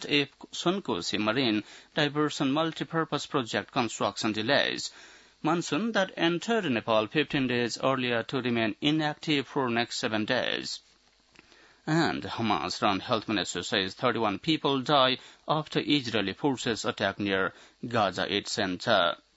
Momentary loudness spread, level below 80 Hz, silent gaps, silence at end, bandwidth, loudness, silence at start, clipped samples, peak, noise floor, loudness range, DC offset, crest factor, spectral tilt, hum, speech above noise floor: 6 LU; -68 dBFS; none; 0.2 s; 8 kHz; -28 LUFS; 0 s; under 0.1%; -8 dBFS; -63 dBFS; 3 LU; under 0.1%; 20 dB; -4.5 dB/octave; none; 35 dB